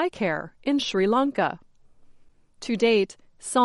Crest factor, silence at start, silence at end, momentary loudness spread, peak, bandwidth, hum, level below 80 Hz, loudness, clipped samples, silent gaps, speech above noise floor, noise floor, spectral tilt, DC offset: 16 dB; 0 s; 0 s; 13 LU; -8 dBFS; 11.5 kHz; none; -60 dBFS; -24 LUFS; under 0.1%; none; 30 dB; -54 dBFS; -4.5 dB/octave; under 0.1%